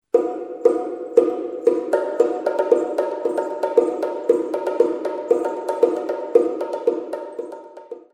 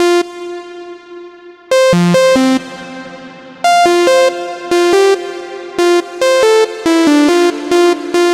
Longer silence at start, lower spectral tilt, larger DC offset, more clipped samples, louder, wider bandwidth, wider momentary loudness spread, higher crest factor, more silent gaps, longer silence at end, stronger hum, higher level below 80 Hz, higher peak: first, 0.15 s vs 0 s; about the same, -5.5 dB/octave vs -4.5 dB/octave; neither; neither; second, -21 LUFS vs -11 LUFS; second, 11 kHz vs 15 kHz; second, 10 LU vs 20 LU; first, 20 dB vs 12 dB; neither; first, 0.15 s vs 0 s; neither; second, -74 dBFS vs -52 dBFS; about the same, -2 dBFS vs 0 dBFS